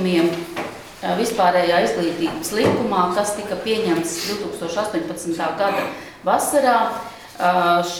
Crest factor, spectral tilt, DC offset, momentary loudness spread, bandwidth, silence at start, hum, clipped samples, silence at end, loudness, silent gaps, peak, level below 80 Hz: 16 dB; -4 dB/octave; under 0.1%; 10 LU; 19.5 kHz; 0 s; none; under 0.1%; 0 s; -20 LUFS; none; -4 dBFS; -54 dBFS